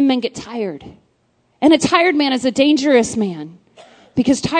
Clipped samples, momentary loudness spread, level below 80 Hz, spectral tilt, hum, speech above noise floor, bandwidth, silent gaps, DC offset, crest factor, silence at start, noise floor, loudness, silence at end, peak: under 0.1%; 14 LU; -52 dBFS; -4 dB/octave; none; 46 dB; 9.4 kHz; none; under 0.1%; 16 dB; 0 s; -61 dBFS; -16 LUFS; 0 s; 0 dBFS